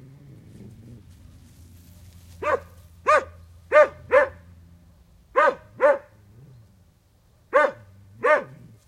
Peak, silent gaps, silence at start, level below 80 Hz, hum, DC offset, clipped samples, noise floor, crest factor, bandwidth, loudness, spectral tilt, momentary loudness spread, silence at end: -4 dBFS; none; 2.4 s; -58 dBFS; none; under 0.1%; under 0.1%; -59 dBFS; 20 dB; 11 kHz; -22 LUFS; -4.5 dB/octave; 10 LU; 0.45 s